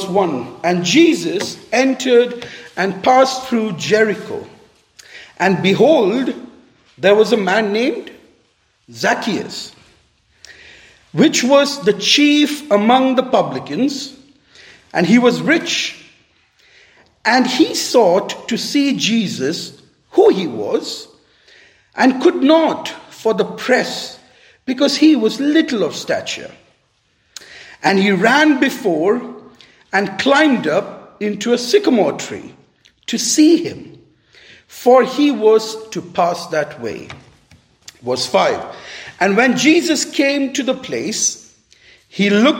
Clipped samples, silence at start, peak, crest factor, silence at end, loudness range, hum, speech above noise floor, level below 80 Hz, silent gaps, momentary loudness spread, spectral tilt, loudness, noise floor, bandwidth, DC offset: under 0.1%; 0 s; 0 dBFS; 16 dB; 0 s; 3 LU; none; 46 dB; -64 dBFS; none; 16 LU; -4 dB/octave; -15 LUFS; -61 dBFS; 16.5 kHz; under 0.1%